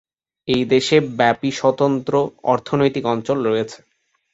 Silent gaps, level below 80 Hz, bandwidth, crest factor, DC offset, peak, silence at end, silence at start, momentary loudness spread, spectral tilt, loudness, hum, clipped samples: none; -56 dBFS; 8 kHz; 18 dB; under 0.1%; -2 dBFS; 0.55 s; 0.45 s; 7 LU; -5.5 dB/octave; -19 LUFS; none; under 0.1%